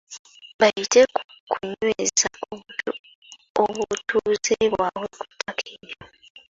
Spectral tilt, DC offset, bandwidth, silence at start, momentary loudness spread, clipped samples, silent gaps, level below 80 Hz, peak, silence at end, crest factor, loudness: -2 dB/octave; under 0.1%; 8 kHz; 0.1 s; 19 LU; under 0.1%; 0.19-0.25 s, 0.54-0.59 s, 1.25-1.29 s, 1.40-1.47 s, 2.99-3.04 s, 3.15-3.22 s, 3.50-3.55 s; -60 dBFS; -4 dBFS; 0.45 s; 20 dB; -23 LUFS